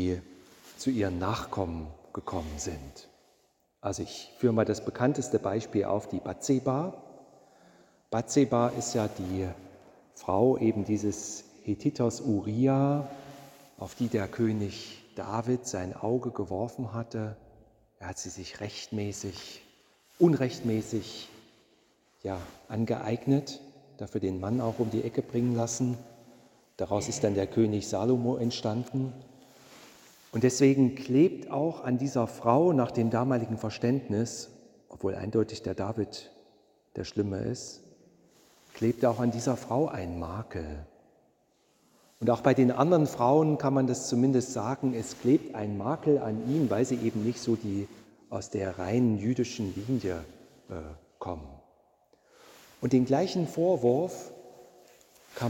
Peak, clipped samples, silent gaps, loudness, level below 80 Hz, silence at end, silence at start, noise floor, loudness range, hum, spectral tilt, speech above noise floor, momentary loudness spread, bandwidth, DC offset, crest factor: -8 dBFS; under 0.1%; none; -29 LUFS; -58 dBFS; 0 s; 0 s; -70 dBFS; 8 LU; none; -6.5 dB/octave; 41 dB; 17 LU; 17 kHz; under 0.1%; 22 dB